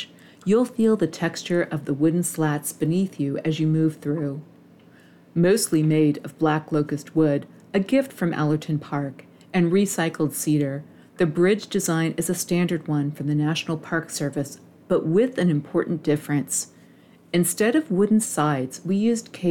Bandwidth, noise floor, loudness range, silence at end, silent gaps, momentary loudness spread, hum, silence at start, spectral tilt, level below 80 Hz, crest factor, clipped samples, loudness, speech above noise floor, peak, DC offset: 18 kHz; -52 dBFS; 2 LU; 0 s; none; 7 LU; none; 0 s; -5.5 dB/octave; -64 dBFS; 14 dB; under 0.1%; -23 LUFS; 29 dB; -8 dBFS; under 0.1%